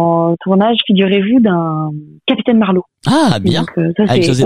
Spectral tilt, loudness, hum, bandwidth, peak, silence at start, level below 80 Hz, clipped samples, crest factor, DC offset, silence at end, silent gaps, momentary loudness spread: -6.5 dB/octave; -13 LUFS; none; 11.5 kHz; 0 dBFS; 0 s; -46 dBFS; under 0.1%; 12 dB; under 0.1%; 0 s; none; 6 LU